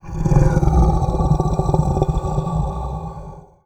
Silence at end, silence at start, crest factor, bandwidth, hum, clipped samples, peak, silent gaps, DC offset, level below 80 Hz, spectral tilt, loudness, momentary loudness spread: 0.25 s; 0.05 s; 18 dB; 8.8 kHz; none; under 0.1%; 0 dBFS; none; under 0.1%; -22 dBFS; -8.5 dB/octave; -19 LUFS; 13 LU